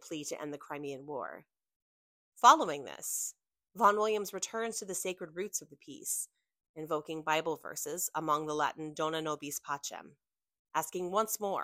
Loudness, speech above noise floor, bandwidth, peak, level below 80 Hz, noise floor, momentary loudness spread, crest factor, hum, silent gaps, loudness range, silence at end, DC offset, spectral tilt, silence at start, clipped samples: -33 LUFS; over 56 dB; 16 kHz; -8 dBFS; -80 dBFS; under -90 dBFS; 14 LU; 26 dB; none; 1.76-2.32 s, 6.69-6.74 s, 10.59-10.65 s; 7 LU; 0 s; under 0.1%; -2.5 dB/octave; 0 s; under 0.1%